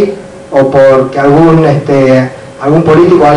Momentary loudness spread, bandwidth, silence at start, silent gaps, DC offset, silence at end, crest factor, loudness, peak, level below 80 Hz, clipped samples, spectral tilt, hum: 9 LU; 10.5 kHz; 0 s; none; under 0.1%; 0 s; 6 dB; -7 LUFS; 0 dBFS; -38 dBFS; 5%; -8 dB/octave; none